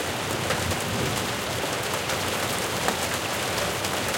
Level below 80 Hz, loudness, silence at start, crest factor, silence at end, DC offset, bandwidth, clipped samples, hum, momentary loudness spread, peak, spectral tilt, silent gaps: -50 dBFS; -26 LUFS; 0 s; 22 dB; 0 s; under 0.1%; 17 kHz; under 0.1%; none; 2 LU; -6 dBFS; -3 dB/octave; none